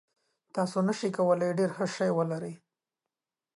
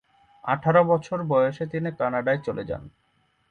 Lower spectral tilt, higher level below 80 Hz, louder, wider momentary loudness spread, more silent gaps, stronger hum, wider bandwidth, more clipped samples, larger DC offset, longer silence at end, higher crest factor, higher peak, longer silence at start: second, -6.5 dB/octave vs -8 dB/octave; second, -80 dBFS vs -58 dBFS; second, -29 LUFS vs -24 LUFS; second, 10 LU vs 13 LU; neither; neither; first, 11.5 kHz vs 7 kHz; neither; neither; first, 1 s vs 0.6 s; about the same, 16 dB vs 18 dB; second, -14 dBFS vs -6 dBFS; about the same, 0.55 s vs 0.45 s